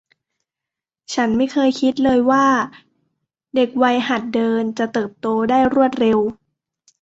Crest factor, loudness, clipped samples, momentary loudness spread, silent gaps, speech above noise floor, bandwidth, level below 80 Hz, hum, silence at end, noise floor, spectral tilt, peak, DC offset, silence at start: 16 dB; -18 LUFS; under 0.1%; 7 LU; none; 70 dB; 8 kHz; -54 dBFS; none; 0.7 s; -86 dBFS; -5 dB/octave; -2 dBFS; under 0.1%; 1.1 s